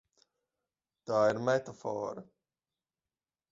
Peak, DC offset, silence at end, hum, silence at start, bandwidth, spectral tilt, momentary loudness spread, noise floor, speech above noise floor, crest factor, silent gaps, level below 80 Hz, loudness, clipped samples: -14 dBFS; under 0.1%; 1.3 s; none; 1.05 s; 7.8 kHz; -6 dB/octave; 17 LU; under -90 dBFS; over 59 dB; 22 dB; none; -76 dBFS; -32 LUFS; under 0.1%